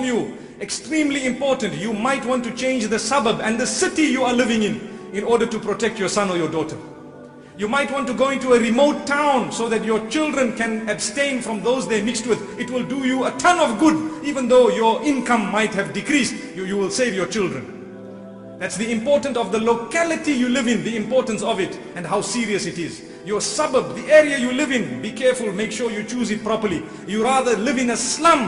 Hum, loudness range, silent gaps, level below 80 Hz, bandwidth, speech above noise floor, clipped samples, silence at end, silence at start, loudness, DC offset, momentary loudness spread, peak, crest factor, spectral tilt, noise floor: none; 4 LU; none; -56 dBFS; 11 kHz; 20 dB; under 0.1%; 0 s; 0 s; -20 LUFS; under 0.1%; 11 LU; 0 dBFS; 20 dB; -4 dB/octave; -40 dBFS